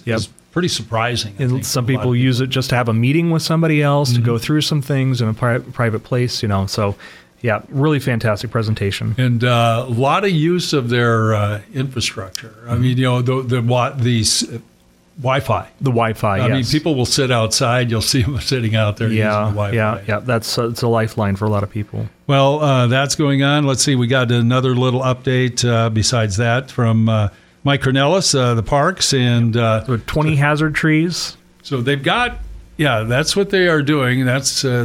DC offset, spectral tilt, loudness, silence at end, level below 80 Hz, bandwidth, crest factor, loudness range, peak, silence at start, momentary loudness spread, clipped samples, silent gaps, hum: under 0.1%; -5 dB/octave; -17 LUFS; 0 s; -42 dBFS; 15.5 kHz; 14 dB; 3 LU; -2 dBFS; 0.05 s; 7 LU; under 0.1%; none; none